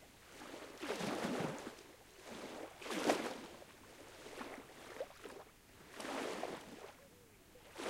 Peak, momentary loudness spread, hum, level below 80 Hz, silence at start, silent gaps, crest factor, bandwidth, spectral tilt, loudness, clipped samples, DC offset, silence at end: -16 dBFS; 18 LU; none; -72 dBFS; 0 s; none; 30 dB; 16 kHz; -3.5 dB/octave; -45 LUFS; under 0.1%; under 0.1%; 0 s